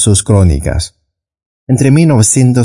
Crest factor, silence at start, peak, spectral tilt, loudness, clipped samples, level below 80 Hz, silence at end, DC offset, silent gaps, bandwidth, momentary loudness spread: 10 dB; 0 s; 0 dBFS; -5.5 dB/octave; -9 LUFS; under 0.1%; -26 dBFS; 0 s; under 0.1%; 1.46-1.67 s; 11.5 kHz; 10 LU